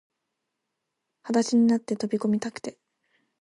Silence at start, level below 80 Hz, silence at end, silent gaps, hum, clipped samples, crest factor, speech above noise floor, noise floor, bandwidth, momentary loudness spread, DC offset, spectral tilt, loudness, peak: 1.25 s; -74 dBFS; 0.7 s; none; none; under 0.1%; 18 dB; 58 dB; -82 dBFS; 11 kHz; 18 LU; under 0.1%; -5.5 dB/octave; -25 LUFS; -10 dBFS